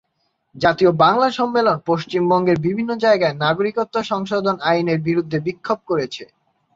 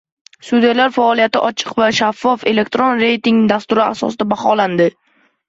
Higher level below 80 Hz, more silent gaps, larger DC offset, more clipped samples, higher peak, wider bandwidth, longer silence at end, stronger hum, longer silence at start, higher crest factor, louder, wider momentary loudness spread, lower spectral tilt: about the same, -58 dBFS vs -58 dBFS; neither; neither; neither; about the same, -2 dBFS vs -2 dBFS; about the same, 7.6 kHz vs 8 kHz; about the same, 0.5 s vs 0.6 s; neither; about the same, 0.55 s vs 0.45 s; about the same, 18 dB vs 14 dB; second, -18 LUFS vs -14 LUFS; first, 8 LU vs 5 LU; first, -6.5 dB/octave vs -5 dB/octave